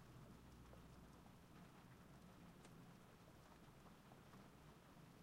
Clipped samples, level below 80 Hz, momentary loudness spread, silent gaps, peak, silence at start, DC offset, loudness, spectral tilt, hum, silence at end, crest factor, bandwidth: under 0.1%; -74 dBFS; 2 LU; none; -50 dBFS; 0 s; under 0.1%; -65 LUFS; -5.5 dB/octave; none; 0 s; 14 dB; 16 kHz